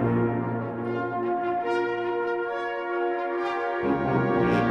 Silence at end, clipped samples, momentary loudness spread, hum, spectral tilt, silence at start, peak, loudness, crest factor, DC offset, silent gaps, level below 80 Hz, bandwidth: 0 s; under 0.1%; 6 LU; none; -8.5 dB/octave; 0 s; -10 dBFS; -27 LUFS; 16 dB; under 0.1%; none; -54 dBFS; 7 kHz